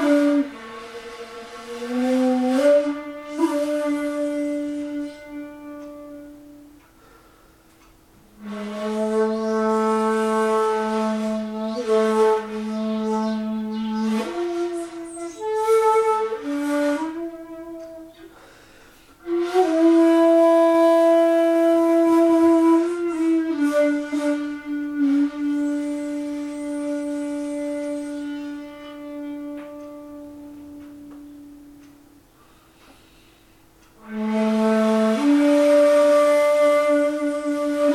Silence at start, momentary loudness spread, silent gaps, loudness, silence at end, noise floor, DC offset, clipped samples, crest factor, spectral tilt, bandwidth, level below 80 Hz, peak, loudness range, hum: 0 s; 21 LU; none; -20 LUFS; 0 s; -53 dBFS; under 0.1%; under 0.1%; 14 dB; -5.5 dB/octave; 14.5 kHz; -60 dBFS; -6 dBFS; 18 LU; none